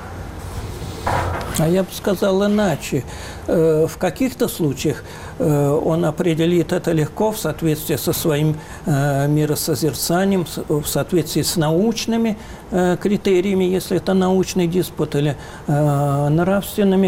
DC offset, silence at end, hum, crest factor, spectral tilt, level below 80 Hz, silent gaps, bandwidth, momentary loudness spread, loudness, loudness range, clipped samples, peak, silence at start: 0.1%; 0 s; none; 12 dB; -6 dB/octave; -40 dBFS; none; 17 kHz; 7 LU; -19 LUFS; 1 LU; under 0.1%; -6 dBFS; 0 s